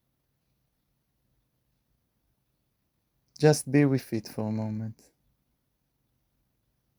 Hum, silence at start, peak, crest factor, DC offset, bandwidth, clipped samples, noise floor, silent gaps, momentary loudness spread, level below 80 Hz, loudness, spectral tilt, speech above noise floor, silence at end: none; 3.4 s; -6 dBFS; 26 dB; under 0.1%; over 20 kHz; under 0.1%; -77 dBFS; none; 12 LU; -72 dBFS; -27 LUFS; -6.5 dB/octave; 51 dB; 2.05 s